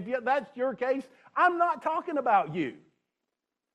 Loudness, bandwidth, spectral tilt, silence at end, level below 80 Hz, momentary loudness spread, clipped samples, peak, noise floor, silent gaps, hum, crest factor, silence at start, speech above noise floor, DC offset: -28 LUFS; 10.5 kHz; -6.5 dB/octave; 1 s; -80 dBFS; 9 LU; under 0.1%; -10 dBFS; -86 dBFS; none; none; 18 dB; 0 s; 58 dB; under 0.1%